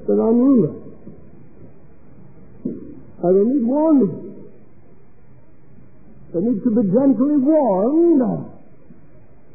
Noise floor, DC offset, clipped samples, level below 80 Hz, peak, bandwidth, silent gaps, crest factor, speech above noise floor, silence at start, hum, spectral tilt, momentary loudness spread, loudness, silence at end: -50 dBFS; 1%; under 0.1%; -58 dBFS; -4 dBFS; 2.5 kHz; none; 14 dB; 34 dB; 0 s; none; -16 dB/octave; 19 LU; -17 LUFS; 1.05 s